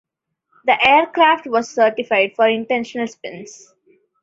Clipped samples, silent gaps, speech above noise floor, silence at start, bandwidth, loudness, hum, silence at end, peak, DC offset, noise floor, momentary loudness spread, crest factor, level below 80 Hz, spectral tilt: under 0.1%; none; 51 dB; 0.65 s; 7.8 kHz; -16 LUFS; none; 0.7 s; 0 dBFS; under 0.1%; -68 dBFS; 14 LU; 18 dB; -62 dBFS; -3.5 dB/octave